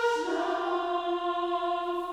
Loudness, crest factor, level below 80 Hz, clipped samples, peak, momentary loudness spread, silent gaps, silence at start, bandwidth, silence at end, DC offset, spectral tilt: -30 LUFS; 14 dB; -64 dBFS; under 0.1%; -16 dBFS; 1 LU; none; 0 s; 12 kHz; 0 s; under 0.1%; -2.5 dB/octave